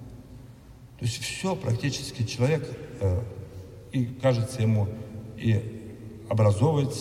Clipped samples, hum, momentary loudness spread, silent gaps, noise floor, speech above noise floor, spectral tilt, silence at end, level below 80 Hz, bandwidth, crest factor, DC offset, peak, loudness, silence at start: under 0.1%; none; 19 LU; none; -48 dBFS; 22 dB; -6.5 dB/octave; 0 s; -54 dBFS; 14.5 kHz; 18 dB; under 0.1%; -10 dBFS; -27 LUFS; 0 s